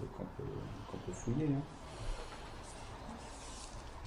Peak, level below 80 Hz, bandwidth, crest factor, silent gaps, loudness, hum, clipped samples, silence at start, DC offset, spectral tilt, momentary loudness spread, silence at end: -24 dBFS; -50 dBFS; 16 kHz; 18 dB; none; -43 LUFS; none; under 0.1%; 0 s; under 0.1%; -6 dB/octave; 12 LU; 0 s